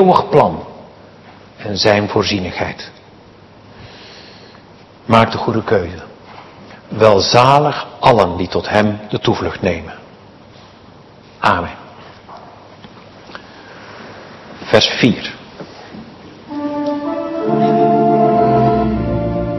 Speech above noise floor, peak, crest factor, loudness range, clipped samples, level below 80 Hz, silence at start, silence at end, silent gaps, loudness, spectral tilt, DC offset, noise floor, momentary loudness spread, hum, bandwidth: 28 dB; 0 dBFS; 16 dB; 10 LU; 0.3%; -40 dBFS; 0 s; 0 s; none; -14 LUFS; -5.5 dB/octave; under 0.1%; -42 dBFS; 25 LU; none; 12 kHz